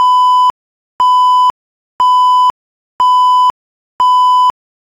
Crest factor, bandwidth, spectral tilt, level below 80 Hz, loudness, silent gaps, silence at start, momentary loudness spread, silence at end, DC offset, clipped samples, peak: 8 dB; 11.5 kHz; -0.5 dB/octave; -58 dBFS; -10 LUFS; 0.50-0.99 s, 1.50-1.99 s, 2.50-2.99 s, 3.50-3.99 s; 0 s; 6 LU; 0.5 s; under 0.1%; under 0.1%; -2 dBFS